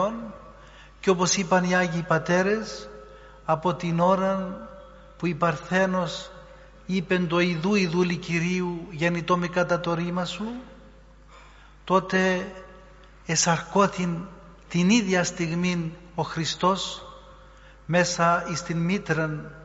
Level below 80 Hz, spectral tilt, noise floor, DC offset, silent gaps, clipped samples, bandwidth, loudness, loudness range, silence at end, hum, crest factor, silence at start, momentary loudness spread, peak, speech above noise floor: -52 dBFS; -4.5 dB/octave; -50 dBFS; under 0.1%; none; under 0.1%; 8 kHz; -25 LUFS; 3 LU; 0 s; none; 20 dB; 0 s; 17 LU; -6 dBFS; 26 dB